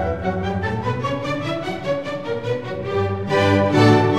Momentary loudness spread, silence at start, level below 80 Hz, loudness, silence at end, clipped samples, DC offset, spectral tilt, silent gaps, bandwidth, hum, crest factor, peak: 10 LU; 0 s; -44 dBFS; -21 LUFS; 0 s; under 0.1%; 0.6%; -7 dB/octave; none; 11.5 kHz; none; 18 dB; -2 dBFS